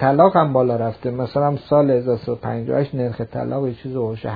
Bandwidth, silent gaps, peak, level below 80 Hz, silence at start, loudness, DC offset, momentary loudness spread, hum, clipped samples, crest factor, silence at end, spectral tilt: 5 kHz; none; 0 dBFS; -52 dBFS; 0 s; -20 LUFS; under 0.1%; 11 LU; none; under 0.1%; 18 dB; 0 s; -11 dB/octave